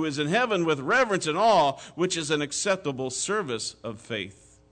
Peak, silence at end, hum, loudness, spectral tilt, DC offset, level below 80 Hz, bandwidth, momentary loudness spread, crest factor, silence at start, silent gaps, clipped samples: -12 dBFS; 0.4 s; none; -25 LUFS; -3.5 dB/octave; under 0.1%; -64 dBFS; 9.4 kHz; 12 LU; 14 dB; 0 s; none; under 0.1%